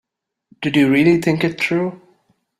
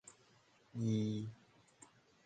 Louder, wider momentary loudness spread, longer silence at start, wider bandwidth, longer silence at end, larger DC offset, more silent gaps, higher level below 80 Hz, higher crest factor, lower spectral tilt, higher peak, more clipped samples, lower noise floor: first, -17 LUFS vs -41 LUFS; second, 11 LU vs 26 LU; first, 0.6 s vs 0.05 s; first, 14 kHz vs 9.2 kHz; second, 0.65 s vs 0.9 s; neither; neither; first, -56 dBFS vs -78 dBFS; about the same, 16 dB vs 18 dB; about the same, -6.5 dB/octave vs -7 dB/octave; first, -2 dBFS vs -26 dBFS; neither; second, -60 dBFS vs -70 dBFS